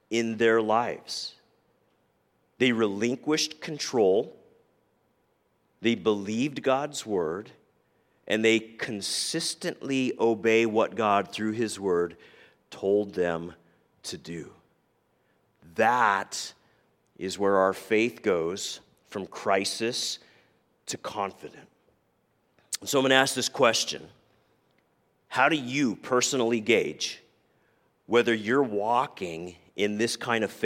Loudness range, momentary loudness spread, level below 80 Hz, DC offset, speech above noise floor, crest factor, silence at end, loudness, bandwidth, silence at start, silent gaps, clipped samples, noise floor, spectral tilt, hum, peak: 5 LU; 15 LU; -72 dBFS; under 0.1%; 44 dB; 26 dB; 0 s; -27 LUFS; 16.5 kHz; 0.1 s; none; under 0.1%; -70 dBFS; -3.5 dB/octave; none; -4 dBFS